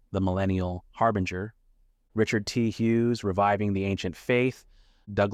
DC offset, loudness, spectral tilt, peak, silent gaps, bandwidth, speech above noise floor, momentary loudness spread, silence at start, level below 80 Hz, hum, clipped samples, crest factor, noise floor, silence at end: under 0.1%; -27 LUFS; -6.5 dB/octave; -10 dBFS; none; 14 kHz; 37 dB; 9 LU; 0.1 s; -54 dBFS; none; under 0.1%; 16 dB; -63 dBFS; 0 s